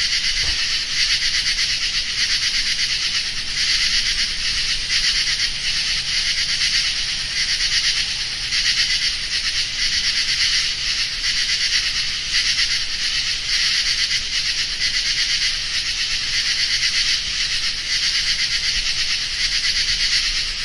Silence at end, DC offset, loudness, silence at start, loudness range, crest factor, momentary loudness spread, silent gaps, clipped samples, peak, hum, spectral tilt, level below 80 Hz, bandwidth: 0 s; under 0.1%; -17 LUFS; 0 s; 0 LU; 16 dB; 3 LU; none; under 0.1%; -4 dBFS; none; 1.5 dB/octave; -36 dBFS; 11.5 kHz